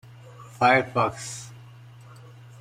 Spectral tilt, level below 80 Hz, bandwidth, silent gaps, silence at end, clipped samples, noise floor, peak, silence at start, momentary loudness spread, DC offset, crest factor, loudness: -4.5 dB/octave; -62 dBFS; 15 kHz; none; 1.1 s; under 0.1%; -47 dBFS; -4 dBFS; 0.4 s; 25 LU; under 0.1%; 22 dB; -23 LUFS